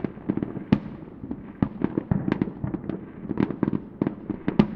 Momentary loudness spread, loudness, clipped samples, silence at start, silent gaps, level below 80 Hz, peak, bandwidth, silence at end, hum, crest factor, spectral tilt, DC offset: 12 LU; -28 LUFS; under 0.1%; 0 s; none; -48 dBFS; -4 dBFS; 5.8 kHz; 0 s; none; 24 dB; -10 dB/octave; under 0.1%